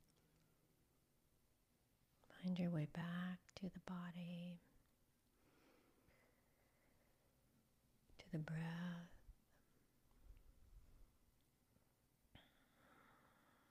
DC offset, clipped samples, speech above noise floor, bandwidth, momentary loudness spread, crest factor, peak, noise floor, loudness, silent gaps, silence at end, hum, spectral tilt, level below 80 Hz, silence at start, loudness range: under 0.1%; under 0.1%; 33 dB; 15 kHz; 14 LU; 22 dB; -32 dBFS; -81 dBFS; -50 LUFS; none; 0.55 s; none; -7.5 dB/octave; -76 dBFS; 2.3 s; 10 LU